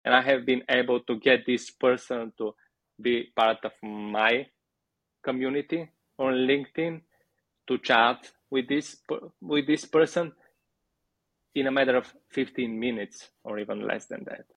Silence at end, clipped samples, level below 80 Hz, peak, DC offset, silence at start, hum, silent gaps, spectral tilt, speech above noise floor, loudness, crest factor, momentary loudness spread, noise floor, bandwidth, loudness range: 0.15 s; under 0.1%; -72 dBFS; -6 dBFS; under 0.1%; 0.05 s; none; none; -4.5 dB/octave; 56 dB; -27 LUFS; 22 dB; 13 LU; -83 dBFS; 10.5 kHz; 4 LU